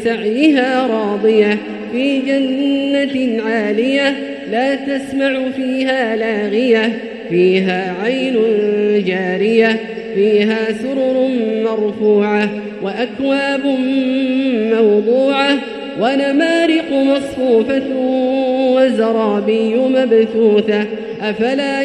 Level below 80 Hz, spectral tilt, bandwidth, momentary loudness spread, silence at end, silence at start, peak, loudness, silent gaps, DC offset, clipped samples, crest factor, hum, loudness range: -56 dBFS; -6 dB/octave; 11 kHz; 6 LU; 0 s; 0 s; 0 dBFS; -15 LUFS; none; under 0.1%; under 0.1%; 14 dB; none; 2 LU